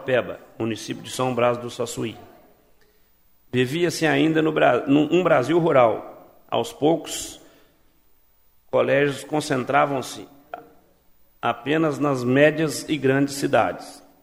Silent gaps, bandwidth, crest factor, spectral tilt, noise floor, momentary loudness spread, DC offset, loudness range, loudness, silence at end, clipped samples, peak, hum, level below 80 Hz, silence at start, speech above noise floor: none; 16 kHz; 20 dB; -5.5 dB/octave; -59 dBFS; 14 LU; under 0.1%; 6 LU; -22 LUFS; 0.25 s; under 0.1%; -2 dBFS; none; -60 dBFS; 0 s; 38 dB